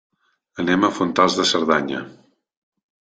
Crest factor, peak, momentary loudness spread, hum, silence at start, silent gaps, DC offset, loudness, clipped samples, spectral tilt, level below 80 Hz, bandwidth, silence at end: 20 dB; -2 dBFS; 16 LU; none; 0.55 s; none; under 0.1%; -19 LUFS; under 0.1%; -4 dB/octave; -60 dBFS; 9.4 kHz; 1.05 s